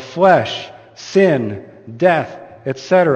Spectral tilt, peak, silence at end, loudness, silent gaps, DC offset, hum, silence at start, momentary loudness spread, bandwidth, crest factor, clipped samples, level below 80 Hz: -6 dB/octave; 0 dBFS; 0 s; -16 LUFS; none; under 0.1%; none; 0 s; 20 LU; 8.4 kHz; 16 dB; under 0.1%; -60 dBFS